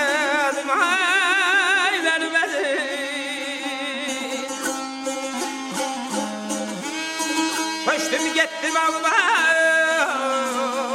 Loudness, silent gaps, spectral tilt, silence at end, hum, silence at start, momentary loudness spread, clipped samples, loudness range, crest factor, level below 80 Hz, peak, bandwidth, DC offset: -21 LUFS; none; -1 dB/octave; 0 s; none; 0 s; 10 LU; under 0.1%; 7 LU; 16 dB; -70 dBFS; -6 dBFS; 16 kHz; under 0.1%